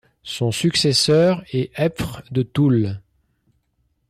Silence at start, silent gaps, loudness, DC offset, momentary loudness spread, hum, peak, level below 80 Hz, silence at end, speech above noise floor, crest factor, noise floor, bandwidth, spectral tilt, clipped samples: 0.25 s; none; -19 LUFS; under 0.1%; 12 LU; none; -6 dBFS; -50 dBFS; 1.1 s; 49 dB; 14 dB; -68 dBFS; 14.5 kHz; -5 dB/octave; under 0.1%